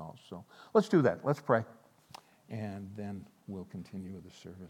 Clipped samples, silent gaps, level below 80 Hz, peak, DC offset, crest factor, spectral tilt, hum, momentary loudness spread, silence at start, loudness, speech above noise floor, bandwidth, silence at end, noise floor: under 0.1%; none; -78 dBFS; -12 dBFS; under 0.1%; 24 dB; -7.5 dB/octave; none; 22 LU; 0 s; -33 LUFS; 23 dB; 17 kHz; 0 s; -56 dBFS